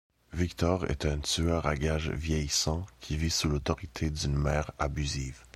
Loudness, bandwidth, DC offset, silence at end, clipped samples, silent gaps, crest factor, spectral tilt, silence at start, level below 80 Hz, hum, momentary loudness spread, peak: -31 LUFS; 14.5 kHz; under 0.1%; 0.1 s; under 0.1%; none; 20 dB; -4.5 dB/octave; 0.3 s; -38 dBFS; none; 6 LU; -12 dBFS